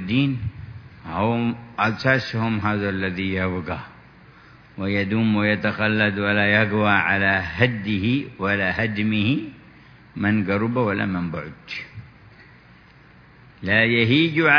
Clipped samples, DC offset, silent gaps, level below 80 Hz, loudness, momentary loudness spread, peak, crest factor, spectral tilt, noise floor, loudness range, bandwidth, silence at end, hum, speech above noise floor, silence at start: under 0.1%; under 0.1%; none; -52 dBFS; -21 LUFS; 15 LU; 0 dBFS; 22 dB; -7.5 dB/octave; -49 dBFS; 6 LU; 5.4 kHz; 0 s; none; 28 dB; 0 s